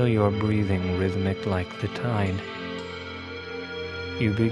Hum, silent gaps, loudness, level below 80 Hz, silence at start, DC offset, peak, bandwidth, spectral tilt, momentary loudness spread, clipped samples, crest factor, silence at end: none; none; -27 LUFS; -52 dBFS; 0 s; under 0.1%; -6 dBFS; 10.5 kHz; -7.5 dB/octave; 12 LU; under 0.1%; 20 dB; 0 s